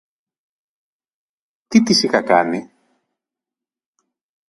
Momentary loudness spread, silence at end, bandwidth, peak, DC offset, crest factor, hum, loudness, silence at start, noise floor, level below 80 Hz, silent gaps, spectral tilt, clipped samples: 9 LU; 1.85 s; 11.5 kHz; 0 dBFS; under 0.1%; 22 dB; none; -16 LUFS; 1.7 s; -89 dBFS; -66 dBFS; none; -4 dB/octave; under 0.1%